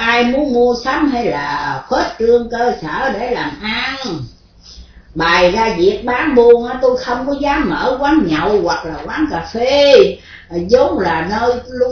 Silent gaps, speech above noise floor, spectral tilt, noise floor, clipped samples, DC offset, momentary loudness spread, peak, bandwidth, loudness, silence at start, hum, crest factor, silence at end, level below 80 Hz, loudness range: none; 24 dB; -5 dB/octave; -38 dBFS; 0.3%; under 0.1%; 10 LU; 0 dBFS; 5.4 kHz; -14 LUFS; 0 s; none; 14 dB; 0 s; -38 dBFS; 4 LU